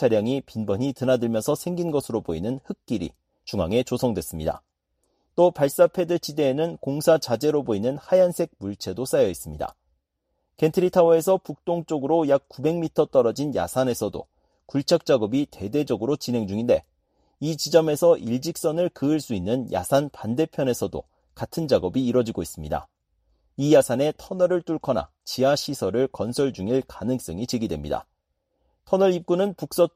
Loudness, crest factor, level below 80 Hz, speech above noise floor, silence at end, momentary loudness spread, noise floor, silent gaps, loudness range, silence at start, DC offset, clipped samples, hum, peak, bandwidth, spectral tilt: -24 LUFS; 20 dB; -52 dBFS; 53 dB; 0.1 s; 11 LU; -76 dBFS; none; 4 LU; 0 s; under 0.1%; under 0.1%; none; -4 dBFS; 15.5 kHz; -6 dB/octave